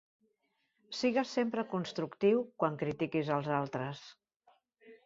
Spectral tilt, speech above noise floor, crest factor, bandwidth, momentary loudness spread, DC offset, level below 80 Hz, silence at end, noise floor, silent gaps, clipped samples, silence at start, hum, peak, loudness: -6.5 dB/octave; 46 dB; 20 dB; 7.8 kHz; 9 LU; under 0.1%; -74 dBFS; 0.1 s; -79 dBFS; 4.36-4.40 s; under 0.1%; 0.9 s; none; -16 dBFS; -34 LUFS